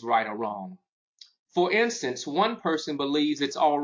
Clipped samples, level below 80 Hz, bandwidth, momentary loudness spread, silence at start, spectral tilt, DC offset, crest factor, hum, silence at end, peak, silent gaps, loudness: under 0.1%; -74 dBFS; 7.6 kHz; 9 LU; 0 s; -4 dB/octave; under 0.1%; 16 dB; none; 0 s; -10 dBFS; 0.89-1.18 s, 1.39-1.46 s; -26 LUFS